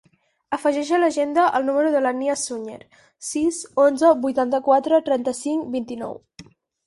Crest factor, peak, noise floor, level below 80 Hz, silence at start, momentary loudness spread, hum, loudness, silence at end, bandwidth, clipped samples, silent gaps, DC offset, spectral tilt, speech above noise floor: 18 dB; -4 dBFS; -48 dBFS; -64 dBFS; 0.5 s; 14 LU; none; -21 LUFS; 0.45 s; 11.5 kHz; under 0.1%; none; under 0.1%; -3.5 dB/octave; 27 dB